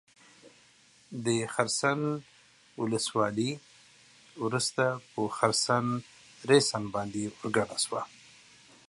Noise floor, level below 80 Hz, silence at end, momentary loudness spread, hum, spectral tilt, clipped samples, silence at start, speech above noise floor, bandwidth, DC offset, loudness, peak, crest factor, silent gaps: -61 dBFS; -68 dBFS; 0.8 s; 12 LU; none; -4 dB/octave; under 0.1%; 0.45 s; 32 dB; 11.5 kHz; under 0.1%; -30 LUFS; -8 dBFS; 24 dB; none